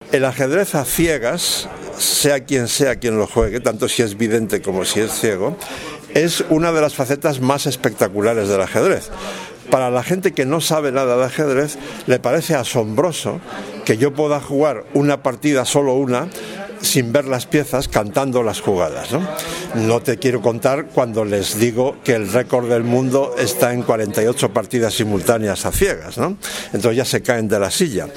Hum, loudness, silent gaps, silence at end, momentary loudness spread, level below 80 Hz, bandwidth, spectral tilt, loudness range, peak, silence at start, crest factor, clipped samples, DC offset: none; -18 LUFS; none; 0 s; 6 LU; -40 dBFS; 17.5 kHz; -4.5 dB/octave; 2 LU; 0 dBFS; 0 s; 18 dB; under 0.1%; under 0.1%